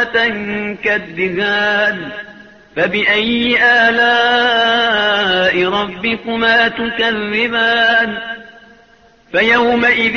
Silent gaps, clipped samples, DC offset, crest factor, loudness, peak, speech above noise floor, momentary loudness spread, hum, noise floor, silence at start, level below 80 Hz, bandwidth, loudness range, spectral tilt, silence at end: none; under 0.1%; under 0.1%; 14 dB; -13 LUFS; -2 dBFS; 34 dB; 9 LU; none; -48 dBFS; 0 s; -48 dBFS; 6.8 kHz; 3 LU; -4.5 dB/octave; 0 s